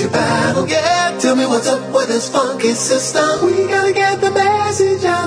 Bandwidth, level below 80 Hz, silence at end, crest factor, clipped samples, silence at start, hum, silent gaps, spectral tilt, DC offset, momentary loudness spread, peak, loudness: 10.5 kHz; -54 dBFS; 0 s; 12 dB; under 0.1%; 0 s; none; none; -3.5 dB/octave; under 0.1%; 2 LU; -2 dBFS; -15 LUFS